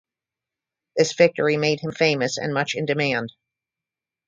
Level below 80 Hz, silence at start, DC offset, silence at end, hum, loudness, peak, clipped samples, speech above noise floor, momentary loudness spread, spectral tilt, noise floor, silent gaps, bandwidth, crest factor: -66 dBFS; 0.95 s; under 0.1%; 0.95 s; none; -21 LUFS; -2 dBFS; under 0.1%; 67 dB; 7 LU; -4.5 dB/octave; -89 dBFS; none; 9.2 kHz; 22 dB